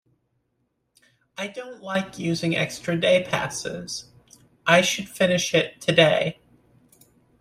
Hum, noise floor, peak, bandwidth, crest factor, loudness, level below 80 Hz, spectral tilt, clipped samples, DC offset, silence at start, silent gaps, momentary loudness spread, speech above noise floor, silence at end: none; -73 dBFS; -2 dBFS; 15.5 kHz; 22 dB; -23 LUFS; -60 dBFS; -4 dB/octave; under 0.1%; under 0.1%; 1.4 s; none; 15 LU; 50 dB; 1.1 s